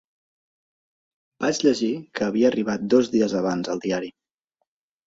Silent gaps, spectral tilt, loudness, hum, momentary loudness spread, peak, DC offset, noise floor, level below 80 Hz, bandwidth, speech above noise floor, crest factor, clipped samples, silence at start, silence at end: none; -5 dB/octave; -23 LUFS; none; 7 LU; -4 dBFS; under 0.1%; -78 dBFS; -64 dBFS; 8 kHz; 56 dB; 20 dB; under 0.1%; 1.4 s; 0.95 s